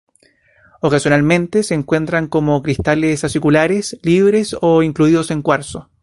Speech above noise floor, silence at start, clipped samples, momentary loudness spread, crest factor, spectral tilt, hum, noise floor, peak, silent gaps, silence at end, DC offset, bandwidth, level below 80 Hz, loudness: 40 dB; 0.85 s; under 0.1%; 4 LU; 14 dB; -6 dB/octave; none; -55 dBFS; 0 dBFS; none; 0.2 s; under 0.1%; 11.5 kHz; -42 dBFS; -15 LUFS